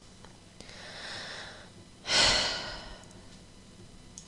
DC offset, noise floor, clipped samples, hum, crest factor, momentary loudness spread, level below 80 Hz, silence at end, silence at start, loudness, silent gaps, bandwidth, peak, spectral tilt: under 0.1%; -52 dBFS; under 0.1%; none; 26 dB; 27 LU; -52 dBFS; 0 s; 0 s; -28 LUFS; none; 11.5 kHz; -10 dBFS; -1 dB/octave